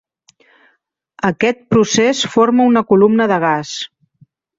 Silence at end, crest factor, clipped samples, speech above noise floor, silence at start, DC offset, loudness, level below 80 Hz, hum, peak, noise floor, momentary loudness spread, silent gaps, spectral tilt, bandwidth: 0.75 s; 14 dB; under 0.1%; 50 dB; 1.25 s; under 0.1%; -14 LUFS; -54 dBFS; none; -2 dBFS; -63 dBFS; 9 LU; none; -4.5 dB/octave; 7.8 kHz